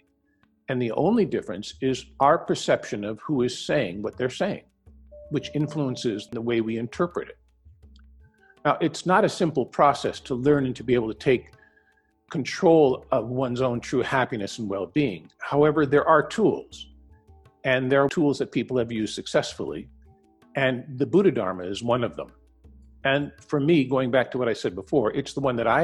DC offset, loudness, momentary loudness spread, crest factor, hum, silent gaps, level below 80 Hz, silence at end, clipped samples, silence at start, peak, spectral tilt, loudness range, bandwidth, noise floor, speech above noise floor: under 0.1%; -24 LUFS; 11 LU; 20 dB; none; none; -56 dBFS; 0 s; under 0.1%; 0.7 s; -4 dBFS; -6 dB/octave; 5 LU; 12 kHz; -66 dBFS; 42 dB